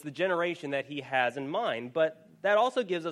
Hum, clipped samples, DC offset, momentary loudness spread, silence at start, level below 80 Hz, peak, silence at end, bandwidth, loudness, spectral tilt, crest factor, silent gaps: none; under 0.1%; under 0.1%; 8 LU; 0.05 s; -80 dBFS; -12 dBFS; 0 s; 11.5 kHz; -30 LUFS; -5 dB/octave; 18 dB; none